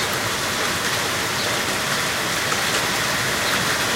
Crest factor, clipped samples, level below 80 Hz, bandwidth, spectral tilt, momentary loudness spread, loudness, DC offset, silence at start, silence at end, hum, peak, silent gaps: 14 dB; under 0.1%; -48 dBFS; 16 kHz; -1.5 dB/octave; 2 LU; -20 LUFS; under 0.1%; 0 s; 0 s; none; -8 dBFS; none